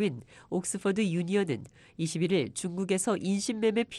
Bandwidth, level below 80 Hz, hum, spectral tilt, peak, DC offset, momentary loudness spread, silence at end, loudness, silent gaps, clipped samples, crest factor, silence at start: 12.5 kHz; -68 dBFS; none; -5 dB/octave; -14 dBFS; under 0.1%; 8 LU; 0 s; -30 LUFS; none; under 0.1%; 16 dB; 0 s